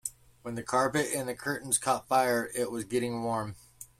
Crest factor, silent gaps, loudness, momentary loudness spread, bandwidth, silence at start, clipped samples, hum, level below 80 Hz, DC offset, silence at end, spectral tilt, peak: 18 dB; none; -30 LUFS; 14 LU; 16 kHz; 0.05 s; under 0.1%; none; -64 dBFS; under 0.1%; 0.15 s; -3.5 dB/octave; -12 dBFS